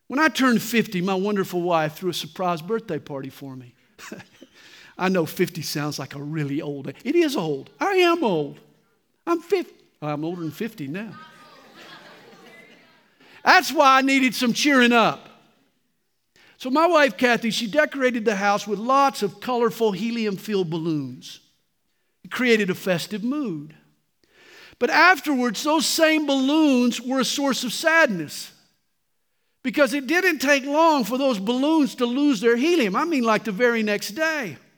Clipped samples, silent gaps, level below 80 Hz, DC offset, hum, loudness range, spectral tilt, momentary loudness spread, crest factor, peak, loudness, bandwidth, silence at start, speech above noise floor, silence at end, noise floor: under 0.1%; none; -74 dBFS; under 0.1%; none; 9 LU; -4 dB/octave; 15 LU; 22 dB; 0 dBFS; -21 LUFS; over 20 kHz; 0.1 s; 54 dB; 0.25 s; -75 dBFS